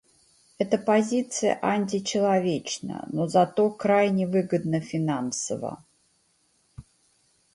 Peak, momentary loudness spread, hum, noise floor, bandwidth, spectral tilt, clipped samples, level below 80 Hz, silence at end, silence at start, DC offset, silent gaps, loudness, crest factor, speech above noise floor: -8 dBFS; 10 LU; none; -67 dBFS; 11.5 kHz; -5 dB/octave; under 0.1%; -64 dBFS; 0.75 s; 0.6 s; under 0.1%; none; -25 LUFS; 18 dB; 43 dB